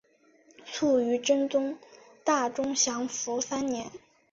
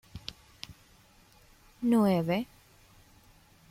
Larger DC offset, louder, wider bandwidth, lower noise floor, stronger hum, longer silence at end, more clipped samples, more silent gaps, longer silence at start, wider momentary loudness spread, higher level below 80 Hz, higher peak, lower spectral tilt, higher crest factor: neither; about the same, -28 LUFS vs -28 LUFS; second, 7.8 kHz vs 16 kHz; about the same, -62 dBFS vs -60 dBFS; neither; second, 0.35 s vs 1.25 s; neither; neither; first, 0.6 s vs 0.15 s; second, 10 LU vs 22 LU; second, -70 dBFS vs -62 dBFS; about the same, -12 dBFS vs -14 dBFS; second, -2 dB/octave vs -7 dB/octave; about the same, 18 dB vs 18 dB